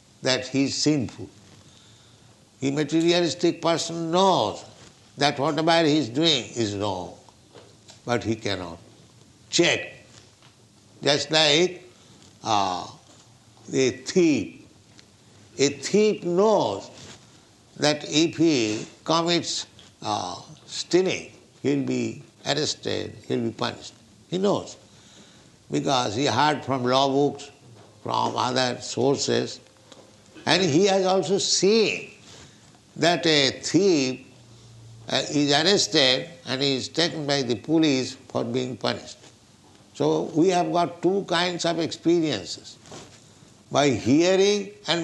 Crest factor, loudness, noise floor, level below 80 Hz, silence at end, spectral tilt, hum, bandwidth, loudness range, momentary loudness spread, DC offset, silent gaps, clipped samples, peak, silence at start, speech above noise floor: 22 dB; -23 LUFS; -54 dBFS; -66 dBFS; 0 s; -4 dB/octave; none; 11.5 kHz; 5 LU; 15 LU; under 0.1%; none; under 0.1%; -4 dBFS; 0.2 s; 31 dB